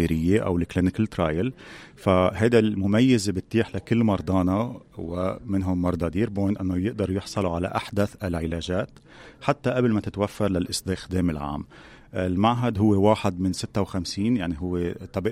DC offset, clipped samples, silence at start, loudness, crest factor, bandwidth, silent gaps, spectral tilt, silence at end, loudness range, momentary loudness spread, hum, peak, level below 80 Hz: under 0.1%; under 0.1%; 0 s; -25 LUFS; 20 dB; 15 kHz; none; -6.5 dB/octave; 0 s; 4 LU; 9 LU; none; -6 dBFS; -46 dBFS